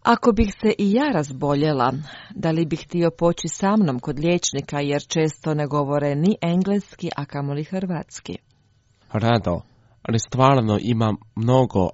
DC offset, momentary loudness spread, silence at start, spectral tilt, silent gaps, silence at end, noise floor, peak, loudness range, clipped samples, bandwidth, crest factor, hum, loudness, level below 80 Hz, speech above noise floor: under 0.1%; 11 LU; 0.05 s; -6 dB/octave; none; 0 s; -60 dBFS; -2 dBFS; 4 LU; under 0.1%; 8 kHz; 18 dB; none; -22 LUFS; -44 dBFS; 39 dB